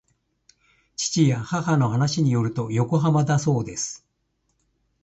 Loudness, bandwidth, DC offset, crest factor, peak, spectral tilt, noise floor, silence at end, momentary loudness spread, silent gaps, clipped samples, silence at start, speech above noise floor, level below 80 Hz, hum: -22 LUFS; 8.2 kHz; under 0.1%; 16 dB; -6 dBFS; -5.5 dB/octave; -72 dBFS; 1.1 s; 9 LU; none; under 0.1%; 1 s; 51 dB; -56 dBFS; none